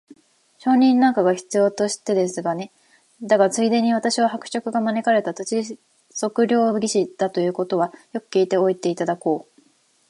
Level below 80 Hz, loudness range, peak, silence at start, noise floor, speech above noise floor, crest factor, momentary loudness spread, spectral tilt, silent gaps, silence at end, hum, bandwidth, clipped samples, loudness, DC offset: -74 dBFS; 2 LU; -2 dBFS; 0.1 s; -60 dBFS; 40 dB; 18 dB; 10 LU; -4.5 dB/octave; none; 0.7 s; none; 11.5 kHz; under 0.1%; -21 LUFS; under 0.1%